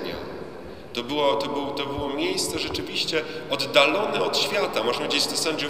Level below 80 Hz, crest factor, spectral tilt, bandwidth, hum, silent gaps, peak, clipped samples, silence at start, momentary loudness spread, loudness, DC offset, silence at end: -52 dBFS; 22 dB; -2.5 dB/octave; 16 kHz; none; none; -2 dBFS; under 0.1%; 0 s; 13 LU; -24 LUFS; 0.5%; 0 s